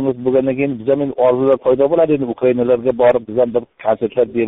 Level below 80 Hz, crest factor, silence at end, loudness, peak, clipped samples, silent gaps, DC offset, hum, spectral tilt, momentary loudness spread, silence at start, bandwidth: -52 dBFS; 12 dB; 0 s; -16 LUFS; -2 dBFS; under 0.1%; none; under 0.1%; none; -7 dB/octave; 5 LU; 0 s; 3.9 kHz